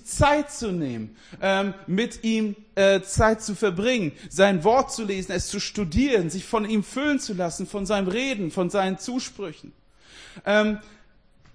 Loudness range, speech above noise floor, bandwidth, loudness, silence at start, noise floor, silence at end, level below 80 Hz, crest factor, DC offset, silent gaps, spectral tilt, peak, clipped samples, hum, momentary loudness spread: 5 LU; 32 dB; 10.5 kHz; -24 LUFS; 0.05 s; -56 dBFS; 0.65 s; -44 dBFS; 18 dB; under 0.1%; none; -4.5 dB/octave; -6 dBFS; under 0.1%; none; 10 LU